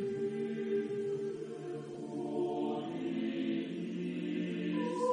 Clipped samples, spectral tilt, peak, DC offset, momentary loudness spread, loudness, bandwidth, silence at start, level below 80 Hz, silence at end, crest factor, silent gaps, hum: under 0.1%; -7 dB/octave; -20 dBFS; under 0.1%; 7 LU; -37 LUFS; 10 kHz; 0 s; -80 dBFS; 0 s; 16 dB; none; none